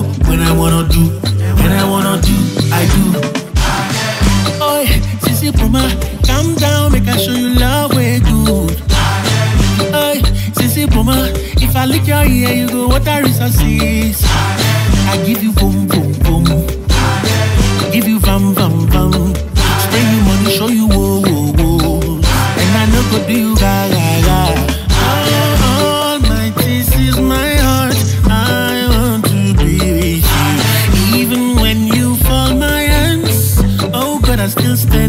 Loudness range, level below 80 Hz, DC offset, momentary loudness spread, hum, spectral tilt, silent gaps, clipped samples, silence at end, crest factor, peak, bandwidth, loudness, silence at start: 1 LU; -18 dBFS; under 0.1%; 3 LU; none; -5 dB/octave; none; under 0.1%; 0 s; 10 dB; 0 dBFS; 16.5 kHz; -12 LUFS; 0 s